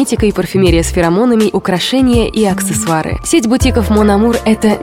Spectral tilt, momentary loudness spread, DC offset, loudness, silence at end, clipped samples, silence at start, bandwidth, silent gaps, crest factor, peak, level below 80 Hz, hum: -5 dB/octave; 3 LU; under 0.1%; -12 LUFS; 0 s; under 0.1%; 0 s; 16.5 kHz; none; 10 dB; 0 dBFS; -24 dBFS; none